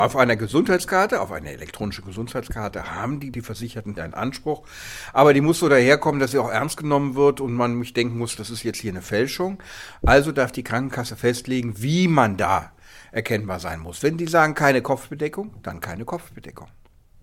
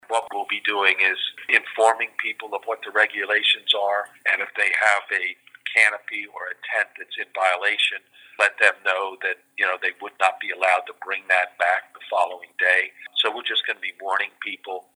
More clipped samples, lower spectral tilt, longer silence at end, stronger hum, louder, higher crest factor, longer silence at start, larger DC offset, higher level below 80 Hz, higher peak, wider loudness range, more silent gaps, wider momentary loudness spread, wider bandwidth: neither; first, -5.5 dB/octave vs 1 dB/octave; first, 0.55 s vs 0.15 s; neither; about the same, -22 LUFS vs -22 LUFS; about the same, 22 dB vs 22 dB; about the same, 0 s vs 0.1 s; neither; first, -40 dBFS vs -90 dBFS; about the same, 0 dBFS vs -2 dBFS; first, 7 LU vs 2 LU; neither; first, 15 LU vs 12 LU; second, 16.5 kHz vs over 20 kHz